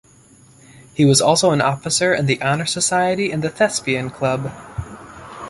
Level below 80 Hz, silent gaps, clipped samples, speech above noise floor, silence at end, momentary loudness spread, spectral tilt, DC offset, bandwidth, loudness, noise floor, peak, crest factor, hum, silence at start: -48 dBFS; none; under 0.1%; 31 dB; 0 s; 18 LU; -4 dB/octave; under 0.1%; 12 kHz; -17 LUFS; -49 dBFS; -2 dBFS; 18 dB; none; 0.95 s